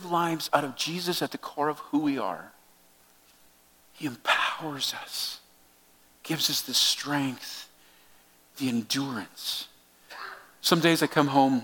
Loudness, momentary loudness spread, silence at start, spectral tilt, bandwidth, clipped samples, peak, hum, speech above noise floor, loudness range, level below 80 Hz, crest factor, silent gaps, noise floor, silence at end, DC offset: -27 LUFS; 18 LU; 0 s; -3.5 dB/octave; 17.5 kHz; under 0.1%; -4 dBFS; none; 32 dB; 5 LU; -74 dBFS; 24 dB; none; -60 dBFS; 0 s; under 0.1%